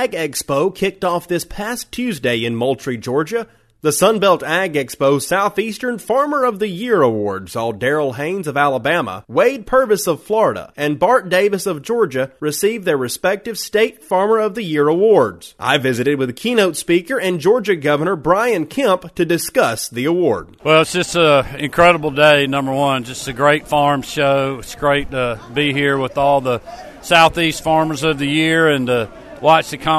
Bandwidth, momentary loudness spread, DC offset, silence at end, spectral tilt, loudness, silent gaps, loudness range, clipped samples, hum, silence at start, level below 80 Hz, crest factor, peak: 13.5 kHz; 9 LU; under 0.1%; 0 s; -4.5 dB/octave; -16 LUFS; none; 4 LU; under 0.1%; none; 0 s; -46 dBFS; 16 dB; 0 dBFS